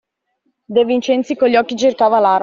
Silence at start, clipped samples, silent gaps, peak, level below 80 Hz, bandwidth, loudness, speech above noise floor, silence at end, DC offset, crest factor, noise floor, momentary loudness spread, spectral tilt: 0.7 s; under 0.1%; none; -2 dBFS; -60 dBFS; 7.4 kHz; -15 LUFS; 54 dB; 0 s; under 0.1%; 14 dB; -67 dBFS; 4 LU; -4.5 dB/octave